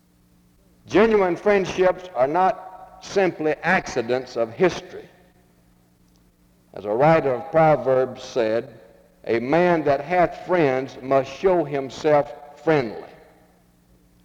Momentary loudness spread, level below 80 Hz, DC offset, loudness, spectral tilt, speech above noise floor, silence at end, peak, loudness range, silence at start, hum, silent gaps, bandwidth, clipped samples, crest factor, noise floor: 15 LU; -54 dBFS; under 0.1%; -21 LUFS; -6.5 dB/octave; 37 dB; 1.2 s; -4 dBFS; 4 LU; 0.9 s; none; none; 10 kHz; under 0.1%; 18 dB; -58 dBFS